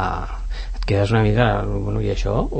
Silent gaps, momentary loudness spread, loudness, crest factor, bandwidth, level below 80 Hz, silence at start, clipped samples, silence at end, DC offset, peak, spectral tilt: none; 13 LU; -21 LUFS; 16 dB; 8.6 kHz; -26 dBFS; 0 s; under 0.1%; 0 s; under 0.1%; -4 dBFS; -7.5 dB/octave